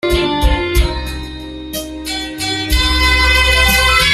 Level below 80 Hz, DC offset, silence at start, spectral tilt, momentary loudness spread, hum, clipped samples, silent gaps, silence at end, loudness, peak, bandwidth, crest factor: -20 dBFS; under 0.1%; 0.05 s; -3.5 dB/octave; 15 LU; none; under 0.1%; none; 0 s; -13 LUFS; 0 dBFS; 16 kHz; 14 dB